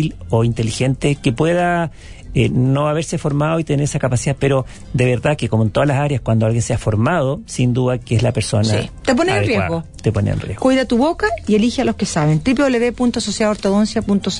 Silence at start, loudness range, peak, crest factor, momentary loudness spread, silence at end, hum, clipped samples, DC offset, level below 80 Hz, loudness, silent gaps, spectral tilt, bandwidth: 0 s; 1 LU; -2 dBFS; 14 dB; 4 LU; 0 s; none; under 0.1%; under 0.1%; -38 dBFS; -17 LUFS; none; -6 dB/octave; 11 kHz